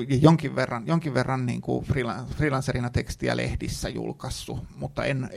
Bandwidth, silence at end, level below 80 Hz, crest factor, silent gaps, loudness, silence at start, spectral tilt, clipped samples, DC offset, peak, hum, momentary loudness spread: 13.5 kHz; 0 s; -42 dBFS; 22 dB; none; -27 LUFS; 0 s; -6.5 dB/octave; under 0.1%; under 0.1%; -2 dBFS; none; 12 LU